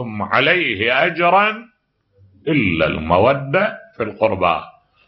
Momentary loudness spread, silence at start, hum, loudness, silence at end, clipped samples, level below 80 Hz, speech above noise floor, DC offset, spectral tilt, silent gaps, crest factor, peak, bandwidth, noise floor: 10 LU; 0 s; none; -17 LUFS; 0.4 s; under 0.1%; -46 dBFS; 40 dB; under 0.1%; -8.5 dB/octave; none; 18 dB; 0 dBFS; 6 kHz; -57 dBFS